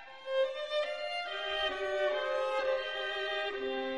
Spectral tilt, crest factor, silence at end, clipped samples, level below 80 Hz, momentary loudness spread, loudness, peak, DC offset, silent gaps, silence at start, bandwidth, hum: -2 dB/octave; 14 dB; 0 s; under 0.1%; -64 dBFS; 4 LU; -34 LUFS; -20 dBFS; 0.1%; none; 0 s; 11 kHz; none